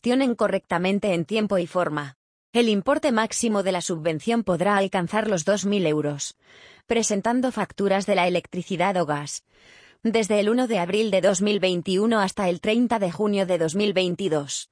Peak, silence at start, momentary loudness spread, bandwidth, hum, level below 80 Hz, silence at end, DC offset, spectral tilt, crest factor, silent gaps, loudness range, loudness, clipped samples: -6 dBFS; 0.05 s; 6 LU; 10.5 kHz; none; -60 dBFS; 0.05 s; under 0.1%; -4.5 dB/octave; 16 dB; 2.16-2.53 s; 2 LU; -23 LUFS; under 0.1%